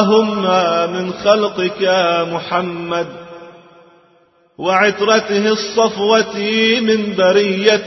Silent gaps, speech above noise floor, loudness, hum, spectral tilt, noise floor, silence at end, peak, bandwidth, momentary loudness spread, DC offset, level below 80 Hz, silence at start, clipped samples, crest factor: none; 39 dB; -15 LUFS; none; -4.5 dB/octave; -54 dBFS; 0 s; 0 dBFS; 6.2 kHz; 8 LU; under 0.1%; -60 dBFS; 0 s; under 0.1%; 16 dB